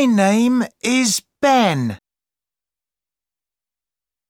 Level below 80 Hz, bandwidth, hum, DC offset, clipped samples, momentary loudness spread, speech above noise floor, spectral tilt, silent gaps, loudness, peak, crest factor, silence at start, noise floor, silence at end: -66 dBFS; 17 kHz; none; under 0.1%; under 0.1%; 9 LU; over 74 dB; -4 dB/octave; none; -17 LUFS; -4 dBFS; 16 dB; 0 s; under -90 dBFS; 2.35 s